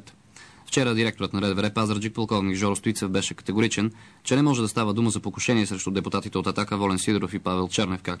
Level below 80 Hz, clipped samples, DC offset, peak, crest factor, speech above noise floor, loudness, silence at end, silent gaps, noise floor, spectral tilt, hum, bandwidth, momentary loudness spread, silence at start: -58 dBFS; under 0.1%; under 0.1%; -10 dBFS; 14 dB; 25 dB; -25 LUFS; 0 s; none; -50 dBFS; -5 dB/octave; none; 11 kHz; 5 LU; 0.35 s